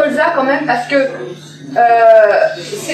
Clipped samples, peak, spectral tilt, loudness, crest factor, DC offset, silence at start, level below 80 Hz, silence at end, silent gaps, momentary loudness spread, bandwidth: under 0.1%; 0 dBFS; -4 dB/octave; -11 LUFS; 12 dB; under 0.1%; 0 s; -66 dBFS; 0 s; none; 18 LU; 13 kHz